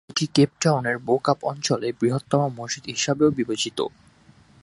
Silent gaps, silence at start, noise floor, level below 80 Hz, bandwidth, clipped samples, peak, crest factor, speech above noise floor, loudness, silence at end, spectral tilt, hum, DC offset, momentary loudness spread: none; 0.1 s; -54 dBFS; -60 dBFS; 11.5 kHz; under 0.1%; -4 dBFS; 20 dB; 31 dB; -23 LUFS; 0.75 s; -4.5 dB/octave; none; under 0.1%; 7 LU